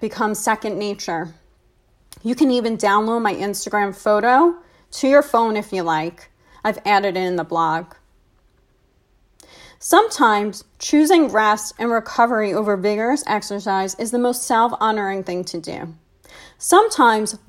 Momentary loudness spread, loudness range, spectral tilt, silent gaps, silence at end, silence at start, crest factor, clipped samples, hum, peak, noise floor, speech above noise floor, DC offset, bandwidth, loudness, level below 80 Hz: 12 LU; 5 LU; -3.5 dB/octave; none; 0.1 s; 0 s; 18 dB; under 0.1%; none; 0 dBFS; -60 dBFS; 41 dB; under 0.1%; 16 kHz; -18 LUFS; -58 dBFS